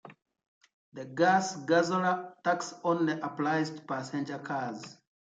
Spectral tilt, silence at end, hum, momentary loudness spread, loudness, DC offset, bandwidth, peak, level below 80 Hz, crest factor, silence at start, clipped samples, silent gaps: -5 dB/octave; 0.35 s; none; 15 LU; -30 LUFS; under 0.1%; 9.2 kHz; -12 dBFS; -80 dBFS; 18 dB; 0.05 s; under 0.1%; 0.48-0.61 s, 0.73-0.92 s